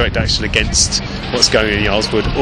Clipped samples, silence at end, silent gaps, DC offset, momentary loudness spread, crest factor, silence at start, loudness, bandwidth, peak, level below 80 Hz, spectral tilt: under 0.1%; 0 s; none; under 0.1%; 5 LU; 16 dB; 0 s; -14 LUFS; 17 kHz; 0 dBFS; -24 dBFS; -3 dB/octave